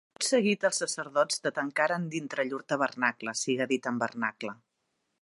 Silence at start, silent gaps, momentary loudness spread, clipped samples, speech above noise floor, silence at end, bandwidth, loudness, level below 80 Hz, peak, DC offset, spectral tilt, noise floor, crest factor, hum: 0.2 s; none; 7 LU; under 0.1%; 50 dB; 0.65 s; 11.5 kHz; -29 LUFS; -82 dBFS; -10 dBFS; under 0.1%; -3 dB/octave; -79 dBFS; 20 dB; none